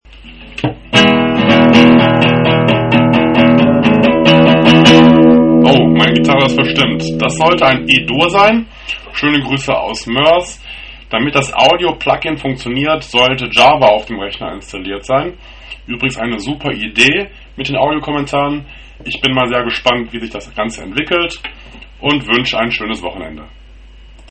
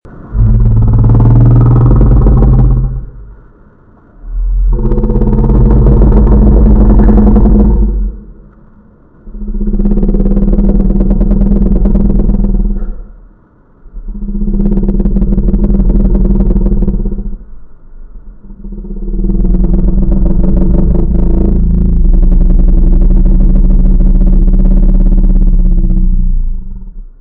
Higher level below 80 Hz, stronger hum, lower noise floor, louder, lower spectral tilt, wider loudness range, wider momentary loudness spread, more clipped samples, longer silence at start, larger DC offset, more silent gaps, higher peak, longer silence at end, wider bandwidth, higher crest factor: second, -36 dBFS vs -8 dBFS; neither; second, -37 dBFS vs -43 dBFS; about the same, -11 LUFS vs -11 LUFS; second, -5.5 dB/octave vs -13.5 dB/octave; about the same, 9 LU vs 8 LU; about the same, 16 LU vs 14 LU; first, 0.3% vs under 0.1%; first, 0.25 s vs 0.05 s; neither; neither; about the same, 0 dBFS vs 0 dBFS; first, 0.85 s vs 0.15 s; first, 9 kHz vs 1.9 kHz; first, 12 dB vs 6 dB